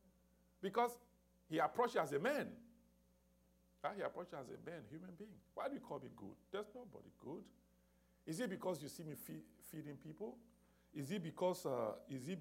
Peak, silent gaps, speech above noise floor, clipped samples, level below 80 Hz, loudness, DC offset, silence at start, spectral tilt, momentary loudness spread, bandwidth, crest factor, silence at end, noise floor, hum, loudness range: -24 dBFS; none; 30 dB; under 0.1%; -80 dBFS; -45 LUFS; under 0.1%; 0.6 s; -5.5 dB/octave; 17 LU; 16 kHz; 22 dB; 0 s; -75 dBFS; 60 Hz at -75 dBFS; 9 LU